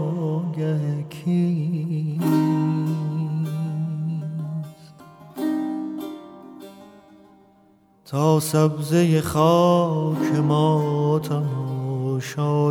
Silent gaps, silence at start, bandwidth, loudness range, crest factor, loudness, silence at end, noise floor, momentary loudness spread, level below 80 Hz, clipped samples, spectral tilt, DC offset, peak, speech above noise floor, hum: none; 0 s; 17 kHz; 12 LU; 18 dB; -22 LUFS; 0 s; -56 dBFS; 13 LU; -60 dBFS; under 0.1%; -7.5 dB/octave; under 0.1%; -4 dBFS; 37 dB; none